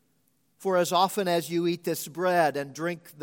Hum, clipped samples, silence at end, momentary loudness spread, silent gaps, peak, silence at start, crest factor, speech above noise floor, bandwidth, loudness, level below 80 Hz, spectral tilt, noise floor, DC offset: none; under 0.1%; 0 s; 9 LU; none; -10 dBFS; 0.6 s; 18 dB; 44 dB; 17 kHz; -27 LUFS; -80 dBFS; -4.5 dB/octave; -71 dBFS; under 0.1%